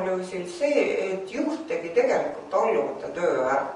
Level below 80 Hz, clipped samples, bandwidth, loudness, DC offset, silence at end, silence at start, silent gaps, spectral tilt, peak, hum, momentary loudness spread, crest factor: -66 dBFS; under 0.1%; 11 kHz; -26 LUFS; under 0.1%; 0 s; 0 s; none; -5 dB/octave; -10 dBFS; none; 7 LU; 16 dB